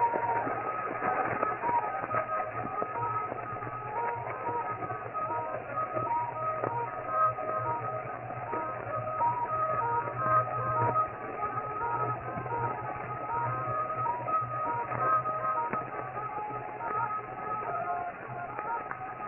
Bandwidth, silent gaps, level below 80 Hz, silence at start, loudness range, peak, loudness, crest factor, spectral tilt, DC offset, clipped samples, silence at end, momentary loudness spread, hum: 3.2 kHz; none; -62 dBFS; 0 s; 4 LU; -12 dBFS; -32 LUFS; 20 dB; -7 dB/octave; under 0.1%; under 0.1%; 0 s; 8 LU; none